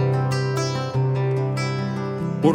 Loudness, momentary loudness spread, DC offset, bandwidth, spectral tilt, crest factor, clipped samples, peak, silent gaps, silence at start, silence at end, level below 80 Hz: -23 LUFS; 5 LU; under 0.1%; 10 kHz; -7 dB/octave; 18 dB; under 0.1%; -4 dBFS; none; 0 s; 0 s; -56 dBFS